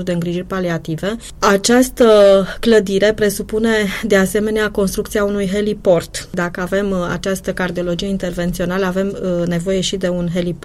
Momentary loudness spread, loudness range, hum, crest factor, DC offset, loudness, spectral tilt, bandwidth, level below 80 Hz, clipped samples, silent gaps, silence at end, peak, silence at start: 9 LU; 6 LU; none; 14 dB; under 0.1%; -16 LUFS; -5 dB/octave; 16 kHz; -36 dBFS; under 0.1%; none; 0 s; -2 dBFS; 0 s